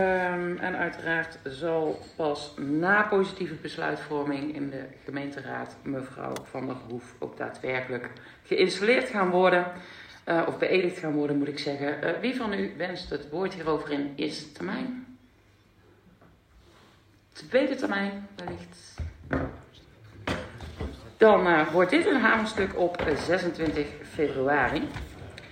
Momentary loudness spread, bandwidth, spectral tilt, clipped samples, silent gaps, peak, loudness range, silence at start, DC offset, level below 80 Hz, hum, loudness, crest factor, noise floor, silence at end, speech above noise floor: 17 LU; 15.5 kHz; -6 dB/octave; under 0.1%; none; -6 dBFS; 11 LU; 0 s; under 0.1%; -52 dBFS; none; -28 LUFS; 22 dB; -60 dBFS; 0 s; 32 dB